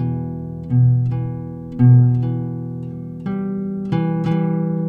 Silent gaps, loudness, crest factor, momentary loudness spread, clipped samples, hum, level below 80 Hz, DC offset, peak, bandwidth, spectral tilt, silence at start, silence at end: none; -19 LUFS; 14 dB; 16 LU; under 0.1%; none; -46 dBFS; under 0.1%; -4 dBFS; 3.7 kHz; -11.5 dB/octave; 0 s; 0 s